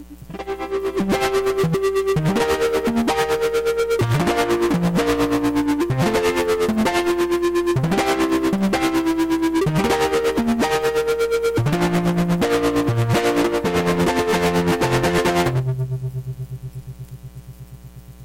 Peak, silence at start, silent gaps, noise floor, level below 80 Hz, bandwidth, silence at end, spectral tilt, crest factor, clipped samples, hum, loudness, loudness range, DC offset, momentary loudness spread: -10 dBFS; 0 s; none; -39 dBFS; -40 dBFS; 16.5 kHz; 0 s; -6 dB/octave; 10 dB; under 0.1%; none; -19 LUFS; 2 LU; under 0.1%; 12 LU